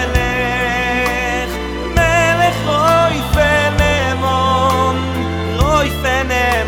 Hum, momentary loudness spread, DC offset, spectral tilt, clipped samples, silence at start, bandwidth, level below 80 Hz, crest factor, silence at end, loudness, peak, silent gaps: none; 7 LU; under 0.1%; -5 dB/octave; under 0.1%; 0 s; 19.5 kHz; -24 dBFS; 14 dB; 0 s; -15 LUFS; 0 dBFS; none